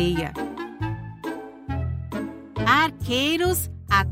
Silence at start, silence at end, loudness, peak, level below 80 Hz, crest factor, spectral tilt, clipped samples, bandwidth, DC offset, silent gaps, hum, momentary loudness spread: 0 s; 0 s; -25 LUFS; -4 dBFS; -40 dBFS; 20 dB; -4.5 dB/octave; under 0.1%; 16 kHz; under 0.1%; none; none; 14 LU